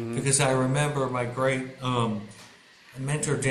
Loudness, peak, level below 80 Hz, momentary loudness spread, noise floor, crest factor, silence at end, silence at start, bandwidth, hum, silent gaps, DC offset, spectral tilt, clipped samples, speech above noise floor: -26 LUFS; -8 dBFS; -56 dBFS; 14 LU; -52 dBFS; 18 dB; 0 s; 0 s; 13 kHz; none; none; under 0.1%; -4.5 dB/octave; under 0.1%; 26 dB